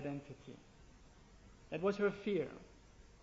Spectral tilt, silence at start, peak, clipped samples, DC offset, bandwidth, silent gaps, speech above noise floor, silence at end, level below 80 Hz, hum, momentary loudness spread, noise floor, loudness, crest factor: -5.5 dB/octave; 0 s; -22 dBFS; under 0.1%; under 0.1%; 7.6 kHz; none; 22 dB; 0.1 s; -66 dBFS; none; 22 LU; -61 dBFS; -39 LUFS; 20 dB